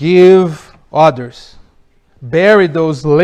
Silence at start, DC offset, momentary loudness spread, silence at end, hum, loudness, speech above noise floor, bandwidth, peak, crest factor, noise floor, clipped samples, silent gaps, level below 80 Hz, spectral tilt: 0 s; under 0.1%; 19 LU; 0 s; none; -10 LUFS; 40 dB; 8.8 kHz; 0 dBFS; 10 dB; -49 dBFS; 1%; none; -46 dBFS; -7 dB/octave